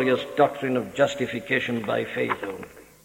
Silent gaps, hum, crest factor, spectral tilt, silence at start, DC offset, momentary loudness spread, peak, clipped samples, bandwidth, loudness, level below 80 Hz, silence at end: none; none; 18 dB; -5.5 dB/octave; 0 s; under 0.1%; 10 LU; -6 dBFS; under 0.1%; 16.5 kHz; -25 LUFS; -62 dBFS; 0.2 s